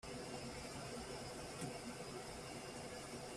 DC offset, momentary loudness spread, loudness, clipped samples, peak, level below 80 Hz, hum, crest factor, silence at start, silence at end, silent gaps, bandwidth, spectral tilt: under 0.1%; 2 LU; -49 LUFS; under 0.1%; -36 dBFS; -64 dBFS; none; 14 dB; 0.05 s; 0 s; none; 15 kHz; -4 dB/octave